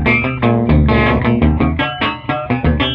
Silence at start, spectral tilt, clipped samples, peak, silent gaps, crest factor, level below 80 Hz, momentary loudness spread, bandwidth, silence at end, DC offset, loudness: 0 s; -9 dB/octave; under 0.1%; -2 dBFS; none; 12 dB; -22 dBFS; 6 LU; 5.2 kHz; 0 s; under 0.1%; -14 LUFS